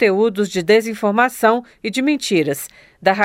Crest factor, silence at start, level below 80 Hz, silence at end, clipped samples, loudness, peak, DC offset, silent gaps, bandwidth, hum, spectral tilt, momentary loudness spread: 16 dB; 0 s; -60 dBFS; 0 s; under 0.1%; -17 LUFS; -2 dBFS; under 0.1%; none; 16.5 kHz; none; -4.5 dB/octave; 8 LU